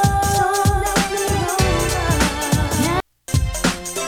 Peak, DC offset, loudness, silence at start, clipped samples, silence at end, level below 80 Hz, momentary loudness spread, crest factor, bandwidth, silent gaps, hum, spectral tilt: -4 dBFS; under 0.1%; -19 LUFS; 0 s; under 0.1%; 0 s; -28 dBFS; 4 LU; 16 dB; over 20 kHz; none; none; -4 dB/octave